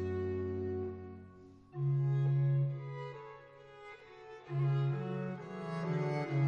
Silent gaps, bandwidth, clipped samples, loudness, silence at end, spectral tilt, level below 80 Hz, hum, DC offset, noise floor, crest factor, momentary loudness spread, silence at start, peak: none; 5.4 kHz; under 0.1%; -36 LUFS; 0 s; -9.5 dB/octave; -68 dBFS; none; under 0.1%; -56 dBFS; 12 dB; 20 LU; 0 s; -22 dBFS